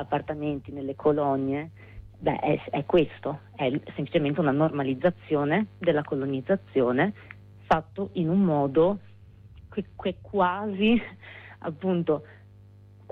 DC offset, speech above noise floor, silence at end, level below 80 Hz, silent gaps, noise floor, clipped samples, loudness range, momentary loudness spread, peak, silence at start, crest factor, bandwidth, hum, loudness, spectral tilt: under 0.1%; 25 dB; 0.75 s; -54 dBFS; none; -51 dBFS; under 0.1%; 2 LU; 12 LU; -10 dBFS; 0 s; 16 dB; 6.2 kHz; none; -27 LUFS; -9 dB/octave